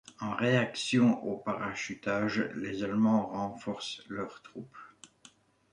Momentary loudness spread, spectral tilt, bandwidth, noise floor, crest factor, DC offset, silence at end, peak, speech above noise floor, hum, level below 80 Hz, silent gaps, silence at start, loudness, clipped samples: 17 LU; -5.5 dB/octave; 10 kHz; -61 dBFS; 18 dB; under 0.1%; 0.65 s; -14 dBFS; 30 dB; none; -68 dBFS; none; 0.2 s; -31 LUFS; under 0.1%